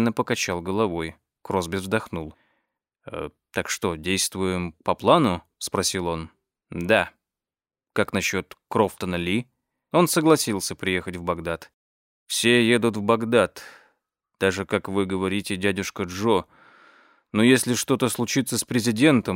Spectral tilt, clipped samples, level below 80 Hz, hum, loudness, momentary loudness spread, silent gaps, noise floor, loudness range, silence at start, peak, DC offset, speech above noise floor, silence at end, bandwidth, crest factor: -4 dB/octave; under 0.1%; -58 dBFS; none; -23 LUFS; 13 LU; 11.74-12.26 s; under -90 dBFS; 5 LU; 0 s; -4 dBFS; under 0.1%; over 67 dB; 0 s; 16 kHz; 20 dB